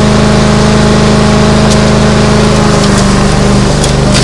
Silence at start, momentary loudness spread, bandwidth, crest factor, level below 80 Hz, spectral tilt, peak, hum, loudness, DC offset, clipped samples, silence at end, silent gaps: 0 s; 1 LU; 11.5 kHz; 6 dB; -16 dBFS; -5.5 dB/octave; 0 dBFS; none; -7 LUFS; under 0.1%; 2%; 0 s; none